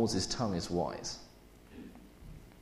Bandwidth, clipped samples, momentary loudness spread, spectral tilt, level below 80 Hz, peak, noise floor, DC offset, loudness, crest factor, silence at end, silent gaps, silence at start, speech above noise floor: 15 kHz; under 0.1%; 22 LU; -4.5 dB/octave; -54 dBFS; -18 dBFS; -57 dBFS; under 0.1%; -35 LUFS; 20 dB; 0 s; none; 0 s; 22 dB